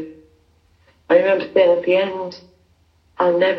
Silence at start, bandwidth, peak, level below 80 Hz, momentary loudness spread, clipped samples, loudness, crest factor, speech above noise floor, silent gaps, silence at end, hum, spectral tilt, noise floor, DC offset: 0 s; 6 kHz; -2 dBFS; -64 dBFS; 15 LU; under 0.1%; -17 LUFS; 18 dB; 41 dB; none; 0 s; none; -6.5 dB/octave; -58 dBFS; under 0.1%